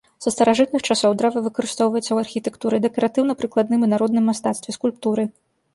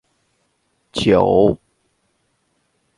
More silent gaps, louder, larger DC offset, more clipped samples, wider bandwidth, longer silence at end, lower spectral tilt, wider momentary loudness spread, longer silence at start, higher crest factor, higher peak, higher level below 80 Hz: neither; second, -20 LUFS vs -16 LUFS; neither; neither; about the same, 11.5 kHz vs 11.5 kHz; second, 0.45 s vs 1.45 s; second, -4.5 dB/octave vs -6.5 dB/octave; second, 7 LU vs 16 LU; second, 0.2 s vs 0.95 s; about the same, 16 dB vs 20 dB; second, -4 dBFS vs 0 dBFS; second, -62 dBFS vs -46 dBFS